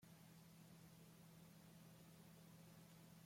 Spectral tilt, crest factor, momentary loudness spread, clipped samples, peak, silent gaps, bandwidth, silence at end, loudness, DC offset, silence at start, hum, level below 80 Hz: -5 dB/octave; 12 dB; 1 LU; under 0.1%; -52 dBFS; none; 16.5 kHz; 0 s; -65 LUFS; under 0.1%; 0 s; none; -86 dBFS